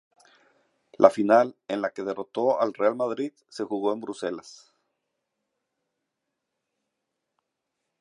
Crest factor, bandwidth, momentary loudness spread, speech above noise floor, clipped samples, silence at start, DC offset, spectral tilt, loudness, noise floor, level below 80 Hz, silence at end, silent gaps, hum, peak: 26 dB; 11.5 kHz; 13 LU; 58 dB; under 0.1%; 1 s; under 0.1%; -5.5 dB/octave; -25 LUFS; -82 dBFS; -78 dBFS; 3.5 s; none; none; -2 dBFS